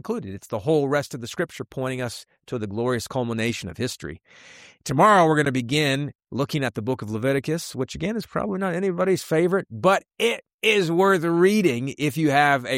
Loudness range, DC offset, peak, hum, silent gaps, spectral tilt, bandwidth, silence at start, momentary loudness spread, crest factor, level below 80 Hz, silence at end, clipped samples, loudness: 7 LU; under 0.1%; -6 dBFS; none; 6.15-6.19 s, 10.54-10.59 s; -5.5 dB/octave; 16 kHz; 0.05 s; 12 LU; 18 dB; -56 dBFS; 0 s; under 0.1%; -23 LUFS